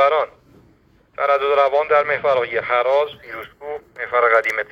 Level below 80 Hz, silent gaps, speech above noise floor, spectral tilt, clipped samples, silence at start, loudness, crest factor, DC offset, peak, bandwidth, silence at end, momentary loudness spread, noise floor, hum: -60 dBFS; none; 36 dB; -4 dB/octave; under 0.1%; 0 s; -18 LUFS; 16 dB; under 0.1%; -2 dBFS; 7.8 kHz; 0.05 s; 16 LU; -55 dBFS; none